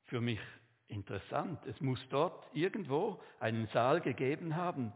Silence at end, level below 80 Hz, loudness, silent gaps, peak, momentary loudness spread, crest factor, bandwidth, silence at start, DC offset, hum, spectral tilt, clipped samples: 0 s; -68 dBFS; -37 LUFS; none; -16 dBFS; 11 LU; 20 dB; 4 kHz; 0.1 s; under 0.1%; none; -5.5 dB/octave; under 0.1%